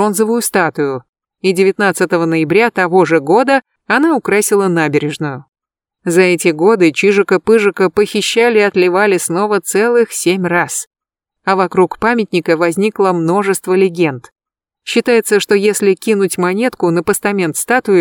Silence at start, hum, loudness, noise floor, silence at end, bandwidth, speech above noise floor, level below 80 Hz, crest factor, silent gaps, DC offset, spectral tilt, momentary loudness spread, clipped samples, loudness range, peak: 0 s; none; -13 LUFS; -74 dBFS; 0 s; 19 kHz; 62 dB; -56 dBFS; 12 dB; 1.09-1.13 s, 10.87-10.91 s; under 0.1%; -4.5 dB/octave; 6 LU; under 0.1%; 3 LU; 0 dBFS